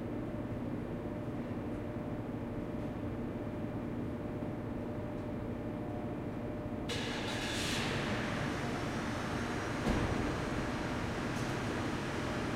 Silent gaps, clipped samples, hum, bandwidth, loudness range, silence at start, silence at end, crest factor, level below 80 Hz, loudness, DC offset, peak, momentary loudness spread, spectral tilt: none; under 0.1%; none; 16.5 kHz; 4 LU; 0 s; 0 s; 18 dB; -50 dBFS; -38 LUFS; under 0.1%; -18 dBFS; 6 LU; -5.5 dB/octave